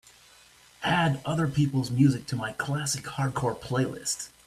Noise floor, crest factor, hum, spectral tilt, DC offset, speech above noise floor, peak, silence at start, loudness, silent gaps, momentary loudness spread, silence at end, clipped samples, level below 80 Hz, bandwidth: -56 dBFS; 18 dB; none; -5 dB/octave; under 0.1%; 29 dB; -10 dBFS; 0.8 s; -27 LUFS; none; 8 LU; 0.2 s; under 0.1%; -58 dBFS; 14.5 kHz